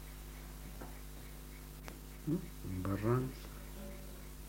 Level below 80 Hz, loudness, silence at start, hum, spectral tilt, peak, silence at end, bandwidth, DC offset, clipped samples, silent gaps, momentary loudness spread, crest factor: -50 dBFS; -43 LUFS; 0 s; none; -6.5 dB/octave; -20 dBFS; 0 s; 16 kHz; under 0.1%; under 0.1%; none; 15 LU; 22 dB